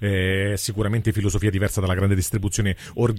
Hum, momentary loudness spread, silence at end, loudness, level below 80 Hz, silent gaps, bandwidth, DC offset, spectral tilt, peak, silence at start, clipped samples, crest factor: none; 3 LU; 0 s; -23 LUFS; -38 dBFS; none; 16 kHz; under 0.1%; -5.5 dB/octave; -6 dBFS; 0 s; under 0.1%; 16 dB